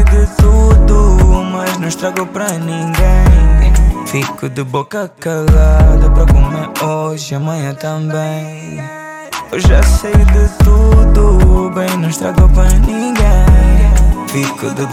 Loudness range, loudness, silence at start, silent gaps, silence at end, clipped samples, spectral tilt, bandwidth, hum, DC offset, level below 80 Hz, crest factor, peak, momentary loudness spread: 5 LU; -12 LUFS; 0 s; none; 0 s; under 0.1%; -6.5 dB/octave; 15 kHz; none; under 0.1%; -10 dBFS; 8 dB; 0 dBFS; 11 LU